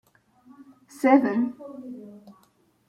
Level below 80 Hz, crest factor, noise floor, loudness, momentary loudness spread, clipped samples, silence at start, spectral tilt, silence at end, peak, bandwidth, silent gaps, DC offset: -76 dBFS; 22 dB; -63 dBFS; -22 LUFS; 23 LU; under 0.1%; 1 s; -6.5 dB/octave; 0.6 s; -6 dBFS; 13 kHz; none; under 0.1%